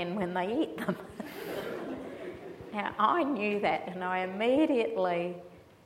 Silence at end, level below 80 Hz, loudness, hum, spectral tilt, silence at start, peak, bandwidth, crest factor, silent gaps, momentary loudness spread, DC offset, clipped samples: 0.25 s; -68 dBFS; -31 LUFS; none; -6.5 dB/octave; 0 s; -14 dBFS; 16 kHz; 18 dB; none; 15 LU; under 0.1%; under 0.1%